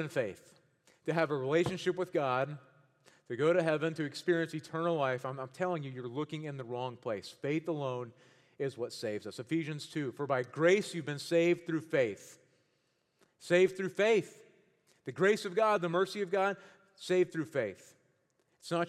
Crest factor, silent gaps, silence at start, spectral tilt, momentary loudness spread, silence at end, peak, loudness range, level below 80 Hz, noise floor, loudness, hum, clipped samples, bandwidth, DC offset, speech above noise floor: 18 dB; none; 0 s; -6 dB/octave; 12 LU; 0 s; -14 dBFS; 6 LU; -78 dBFS; -77 dBFS; -33 LUFS; none; under 0.1%; 13.5 kHz; under 0.1%; 44 dB